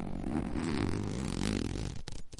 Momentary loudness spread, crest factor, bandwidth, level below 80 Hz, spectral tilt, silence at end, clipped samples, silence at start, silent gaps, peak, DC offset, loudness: 6 LU; 18 dB; 11.5 kHz; -44 dBFS; -6 dB/octave; 0 s; under 0.1%; 0 s; none; -18 dBFS; under 0.1%; -36 LUFS